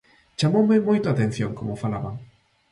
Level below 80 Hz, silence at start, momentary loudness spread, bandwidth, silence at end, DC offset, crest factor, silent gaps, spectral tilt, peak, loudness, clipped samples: -54 dBFS; 0.4 s; 15 LU; 11 kHz; 0.45 s; under 0.1%; 16 dB; none; -7 dB/octave; -8 dBFS; -23 LUFS; under 0.1%